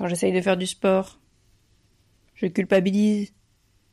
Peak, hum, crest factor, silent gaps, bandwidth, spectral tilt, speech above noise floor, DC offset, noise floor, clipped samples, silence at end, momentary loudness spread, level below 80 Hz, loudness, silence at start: -6 dBFS; none; 18 dB; none; 12.5 kHz; -5.5 dB/octave; 41 dB; under 0.1%; -63 dBFS; under 0.1%; 0.65 s; 9 LU; -62 dBFS; -23 LUFS; 0 s